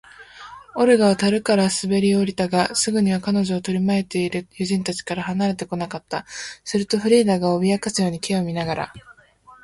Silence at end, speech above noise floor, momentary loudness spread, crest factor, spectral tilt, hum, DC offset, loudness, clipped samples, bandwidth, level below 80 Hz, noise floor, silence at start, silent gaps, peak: 0.5 s; 30 dB; 12 LU; 18 dB; -5 dB/octave; none; under 0.1%; -21 LUFS; under 0.1%; 11.5 kHz; -56 dBFS; -50 dBFS; 0.2 s; none; -4 dBFS